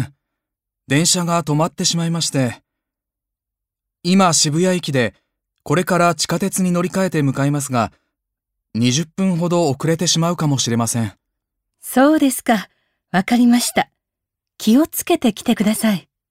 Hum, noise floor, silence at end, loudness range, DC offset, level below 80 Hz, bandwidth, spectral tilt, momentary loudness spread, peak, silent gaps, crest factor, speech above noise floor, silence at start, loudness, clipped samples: none; -84 dBFS; 0.3 s; 2 LU; under 0.1%; -56 dBFS; 16 kHz; -4.5 dB/octave; 8 LU; -2 dBFS; none; 16 dB; 68 dB; 0 s; -17 LUFS; under 0.1%